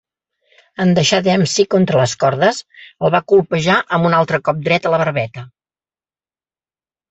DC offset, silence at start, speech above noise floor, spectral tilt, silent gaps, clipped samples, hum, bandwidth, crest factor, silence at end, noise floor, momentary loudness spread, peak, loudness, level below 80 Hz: under 0.1%; 0.8 s; over 75 dB; -5 dB/octave; none; under 0.1%; none; 8.2 kHz; 16 dB; 1.65 s; under -90 dBFS; 7 LU; -2 dBFS; -15 LUFS; -54 dBFS